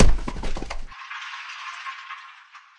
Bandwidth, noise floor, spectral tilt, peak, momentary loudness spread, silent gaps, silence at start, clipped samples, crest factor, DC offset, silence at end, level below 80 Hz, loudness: 8.4 kHz; -48 dBFS; -5 dB/octave; -2 dBFS; 7 LU; none; 0 s; under 0.1%; 20 dB; under 0.1%; 0.2 s; -26 dBFS; -32 LUFS